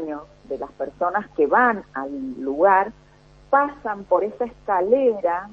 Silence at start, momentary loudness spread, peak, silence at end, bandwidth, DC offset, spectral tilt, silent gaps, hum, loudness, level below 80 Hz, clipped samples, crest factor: 0 s; 14 LU; -4 dBFS; 0 s; 6.6 kHz; under 0.1%; -7.5 dB/octave; none; none; -21 LUFS; -56 dBFS; under 0.1%; 18 dB